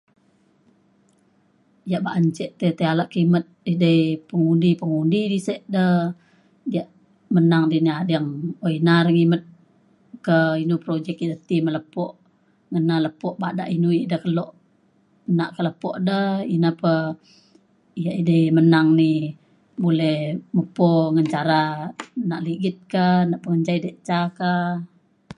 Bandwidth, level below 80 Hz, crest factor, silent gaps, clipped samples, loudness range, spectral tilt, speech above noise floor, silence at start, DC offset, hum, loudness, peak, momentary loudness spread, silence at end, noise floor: 10.5 kHz; -66 dBFS; 18 dB; none; under 0.1%; 4 LU; -8 dB/octave; 41 dB; 1.85 s; under 0.1%; none; -21 LUFS; -4 dBFS; 11 LU; 0.05 s; -61 dBFS